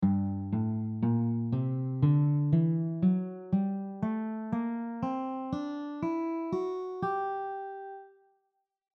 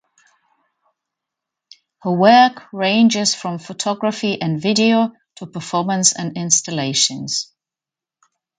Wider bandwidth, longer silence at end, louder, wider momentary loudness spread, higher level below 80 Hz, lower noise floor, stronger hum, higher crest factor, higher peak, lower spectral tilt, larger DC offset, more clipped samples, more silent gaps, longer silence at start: second, 6 kHz vs 9.6 kHz; second, 0.9 s vs 1.15 s; second, -31 LUFS vs -17 LUFS; second, 9 LU vs 13 LU; about the same, -64 dBFS vs -66 dBFS; second, -80 dBFS vs -88 dBFS; neither; about the same, 16 dB vs 20 dB; second, -14 dBFS vs 0 dBFS; first, -11 dB/octave vs -3 dB/octave; neither; neither; neither; second, 0 s vs 2.05 s